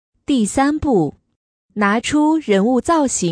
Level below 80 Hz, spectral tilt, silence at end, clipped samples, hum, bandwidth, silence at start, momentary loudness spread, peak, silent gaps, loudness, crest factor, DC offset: -42 dBFS; -4.5 dB/octave; 0 s; under 0.1%; none; 10.5 kHz; 0.3 s; 5 LU; -4 dBFS; 1.36-1.69 s; -17 LUFS; 14 dB; under 0.1%